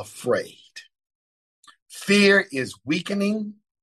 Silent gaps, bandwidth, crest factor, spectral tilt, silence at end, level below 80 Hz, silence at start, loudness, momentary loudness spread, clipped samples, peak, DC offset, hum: 1.15-1.63 s, 1.82-1.86 s; 12.5 kHz; 20 dB; -4.5 dB/octave; 0.3 s; -72 dBFS; 0 s; -21 LUFS; 22 LU; under 0.1%; -6 dBFS; under 0.1%; none